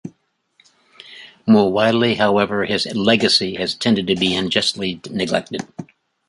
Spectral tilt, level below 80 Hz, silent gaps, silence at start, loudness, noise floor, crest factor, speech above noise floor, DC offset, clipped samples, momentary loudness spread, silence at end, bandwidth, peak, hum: -4.5 dB/octave; -54 dBFS; none; 0.05 s; -17 LUFS; -60 dBFS; 18 dB; 42 dB; under 0.1%; under 0.1%; 15 LU; 0.45 s; 11.5 kHz; -2 dBFS; none